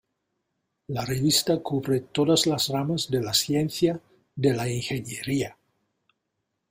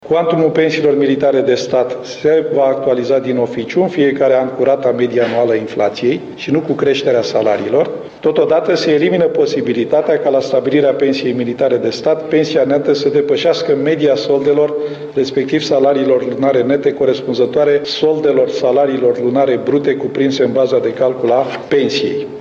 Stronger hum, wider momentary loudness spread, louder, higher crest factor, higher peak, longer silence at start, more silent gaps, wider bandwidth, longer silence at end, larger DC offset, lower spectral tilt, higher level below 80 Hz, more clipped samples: neither; first, 10 LU vs 4 LU; second, -25 LUFS vs -14 LUFS; about the same, 18 dB vs 14 dB; second, -8 dBFS vs 0 dBFS; first, 0.9 s vs 0.05 s; neither; first, 16 kHz vs 7.4 kHz; first, 1.2 s vs 0 s; neither; second, -4.5 dB/octave vs -6 dB/octave; about the same, -58 dBFS vs -58 dBFS; neither